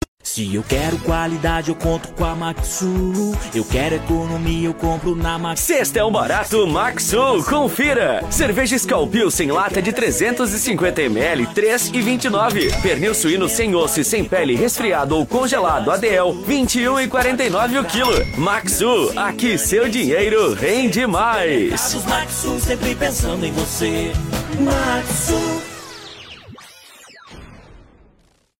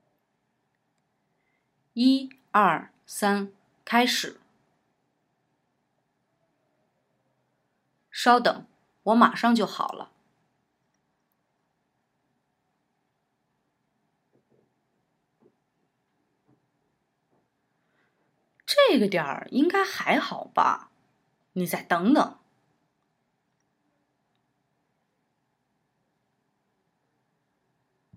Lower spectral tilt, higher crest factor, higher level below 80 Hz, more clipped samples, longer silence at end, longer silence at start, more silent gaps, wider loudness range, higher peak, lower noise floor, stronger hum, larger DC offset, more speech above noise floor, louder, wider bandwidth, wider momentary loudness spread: about the same, -4 dB/octave vs -4.5 dB/octave; second, 14 dB vs 26 dB; first, -32 dBFS vs -88 dBFS; neither; second, 0.8 s vs 5.85 s; second, 0.25 s vs 1.95 s; neither; about the same, 4 LU vs 6 LU; about the same, -4 dBFS vs -4 dBFS; second, -56 dBFS vs -76 dBFS; neither; neither; second, 39 dB vs 53 dB; first, -18 LUFS vs -24 LUFS; about the same, 17 kHz vs 16 kHz; second, 5 LU vs 15 LU